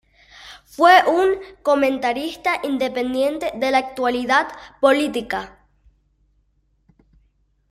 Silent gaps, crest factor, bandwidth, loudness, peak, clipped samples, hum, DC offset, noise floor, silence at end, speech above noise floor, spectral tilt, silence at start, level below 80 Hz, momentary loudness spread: none; 20 dB; 15.5 kHz; -19 LUFS; -2 dBFS; under 0.1%; none; under 0.1%; -64 dBFS; 2.2 s; 45 dB; -3.5 dB/octave; 0.4 s; -56 dBFS; 15 LU